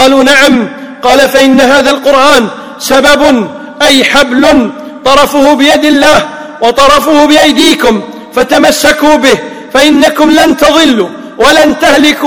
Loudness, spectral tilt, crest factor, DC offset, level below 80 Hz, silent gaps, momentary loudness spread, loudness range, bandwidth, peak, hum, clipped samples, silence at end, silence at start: -5 LUFS; -2.5 dB/octave; 6 dB; 2%; -34 dBFS; none; 8 LU; 1 LU; over 20 kHz; 0 dBFS; none; 10%; 0 s; 0 s